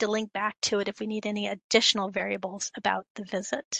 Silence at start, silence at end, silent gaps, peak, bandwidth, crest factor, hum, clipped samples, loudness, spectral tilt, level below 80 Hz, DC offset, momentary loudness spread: 0 s; 0 s; 1.64-1.69 s, 3.10-3.15 s, 3.65-3.71 s; -6 dBFS; 9.4 kHz; 22 dB; none; under 0.1%; -28 LUFS; -2.5 dB/octave; -70 dBFS; under 0.1%; 11 LU